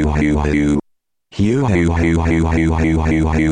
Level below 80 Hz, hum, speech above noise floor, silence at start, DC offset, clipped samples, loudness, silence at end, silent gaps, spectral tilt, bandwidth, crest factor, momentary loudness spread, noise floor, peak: -24 dBFS; none; 50 dB; 0 s; under 0.1%; under 0.1%; -16 LUFS; 0 s; none; -7.5 dB/octave; 9.8 kHz; 12 dB; 4 LU; -64 dBFS; -4 dBFS